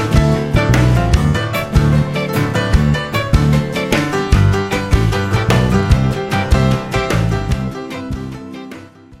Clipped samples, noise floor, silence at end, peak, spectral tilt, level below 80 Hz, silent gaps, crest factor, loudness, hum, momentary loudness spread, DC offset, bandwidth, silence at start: under 0.1%; -35 dBFS; 0.05 s; 0 dBFS; -6.5 dB/octave; -22 dBFS; none; 14 dB; -15 LUFS; none; 11 LU; under 0.1%; 16 kHz; 0 s